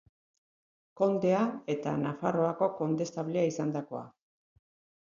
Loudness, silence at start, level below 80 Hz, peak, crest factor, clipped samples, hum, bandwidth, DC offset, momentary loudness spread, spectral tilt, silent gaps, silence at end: -31 LUFS; 0.95 s; -74 dBFS; -14 dBFS; 18 dB; under 0.1%; none; 7.6 kHz; under 0.1%; 7 LU; -7 dB/octave; none; 0.95 s